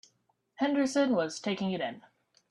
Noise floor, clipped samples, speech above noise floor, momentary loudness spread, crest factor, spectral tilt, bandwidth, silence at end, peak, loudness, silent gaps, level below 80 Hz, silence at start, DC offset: -74 dBFS; under 0.1%; 44 dB; 9 LU; 16 dB; -5 dB/octave; 11 kHz; 0.5 s; -16 dBFS; -30 LUFS; none; -76 dBFS; 0.6 s; under 0.1%